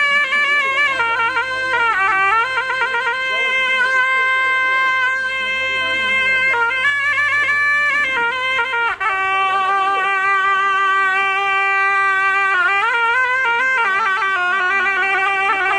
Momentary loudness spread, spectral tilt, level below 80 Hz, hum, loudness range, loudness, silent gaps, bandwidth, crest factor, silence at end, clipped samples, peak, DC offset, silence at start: 4 LU; -1 dB/octave; -56 dBFS; none; 1 LU; -15 LUFS; none; 11.5 kHz; 12 dB; 0 s; under 0.1%; -4 dBFS; under 0.1%; 0 s